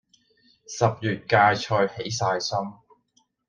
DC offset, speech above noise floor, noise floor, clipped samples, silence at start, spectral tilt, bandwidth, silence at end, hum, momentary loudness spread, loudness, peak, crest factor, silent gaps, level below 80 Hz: under 0.1%; 44 dB; -68 dBFS; under 0.1%; 0.7 s; -4.5 dB/octave; 10 kHz; 0.75 s; none; 11 LU; -23 LUFS; -4 dBFS; 22 dB; none; -62 dBFS